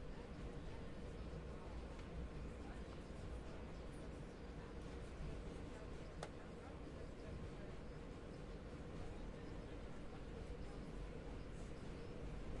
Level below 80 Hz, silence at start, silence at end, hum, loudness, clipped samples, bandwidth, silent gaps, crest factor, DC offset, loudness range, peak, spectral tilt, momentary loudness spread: -54 dBFS; 0 s; 0 s; none; -53 LUFS; under 0.1%; 11 kHz; none; 18 dB; under 0.1%; 1 LU; -32 dBFS; -6.5 dB/octave; 2 LU